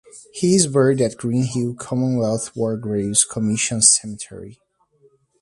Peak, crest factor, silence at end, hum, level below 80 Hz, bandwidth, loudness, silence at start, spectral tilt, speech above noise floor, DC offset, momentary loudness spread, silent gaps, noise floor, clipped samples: 0 dBFS; 20 dB; 0.9 s; none; -54 dBFS; 11.5 kHz; -18 LUFS; 0.15 s; -4 dB/octave; 38 dB; under 0.1%; 16 LU; none; -58 dBFS; under 0.1%